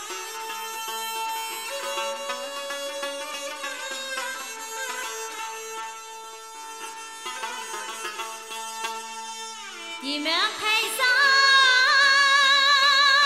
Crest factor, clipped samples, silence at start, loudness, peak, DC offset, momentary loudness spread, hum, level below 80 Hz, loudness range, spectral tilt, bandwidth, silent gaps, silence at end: 18 dB; under 0.1%; 0 s; -22 LUFS; -6 dBFS; 0.1%; 19 LU; none; -78 dBFS; 15 LU; 2.5 dB/octave; 16 kHz; none; 0 s